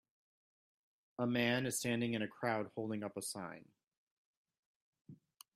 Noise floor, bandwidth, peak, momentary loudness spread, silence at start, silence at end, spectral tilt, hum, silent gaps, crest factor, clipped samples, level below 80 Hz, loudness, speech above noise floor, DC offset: -61 dBFS; 15.5 kHz; -20 dBFS; 13 LU; 1.2 s; 0.4 s; -4.5 dB/octave; none; 3.97-4.45 s, 4.59-4.93 s, 5.01-5.05 s; 22 dB; under 0.1%; -78 dBFS; -38 LUFS; 22 dB; under 0.1%